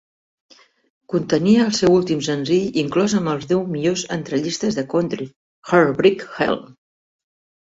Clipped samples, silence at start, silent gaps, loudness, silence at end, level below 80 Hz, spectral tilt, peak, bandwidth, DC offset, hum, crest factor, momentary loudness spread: under 0.1%; 1.1 s; 5.36-5.62 s; -19 LUFS; 1.05 s; -56 dBFS; -5.5 dB/octave; -2 dBFS; 8 kHz; under 0.1%; none; 18 dB; 9 LU